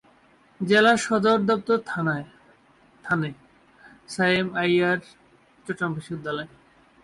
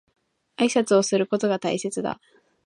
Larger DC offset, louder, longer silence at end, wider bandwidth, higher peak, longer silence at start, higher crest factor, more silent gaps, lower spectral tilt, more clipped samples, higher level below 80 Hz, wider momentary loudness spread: neither; about the same, -23 LUFS vs -23 LUFS; about the same, 0.55 s vs 0.5 s; about the same, 11.5 kHz vs 11.5 kHz; about the same, -8 dBFS vs -6 dBFS; about the same, 0.6 s vs 0.6 s; about the same, 16 dB vs 18 dB; neither; about the same, -5 dB/octave vs -4.5 dB/octave; neither; first, -64 dBFS vs -70 dBFS; first, 17 LU vs 10 LU